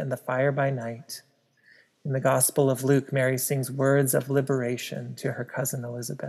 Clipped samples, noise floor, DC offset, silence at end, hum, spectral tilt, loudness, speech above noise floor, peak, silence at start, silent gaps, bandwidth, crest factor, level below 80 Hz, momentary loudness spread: under 0.1%; -60 dBFS; under 0.1%; 0 s; none; -5 dB/octave; -26 LUFS; 35 dB; -8 dBFS; 0 s; none; 15 kHz; 18 dB; -84 dBFS; 13 LU